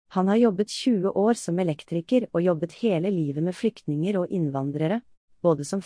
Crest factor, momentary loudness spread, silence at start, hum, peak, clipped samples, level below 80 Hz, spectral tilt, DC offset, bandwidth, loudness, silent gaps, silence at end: 16 dB; 5 LU; 0.1 s; none; -10 dBFS; under 0.1%; -68 dBFS; -7 dB/octave; under 0.1%; 10.5 kHz; -25 LUFS; 5.17-5.28 s; 0 s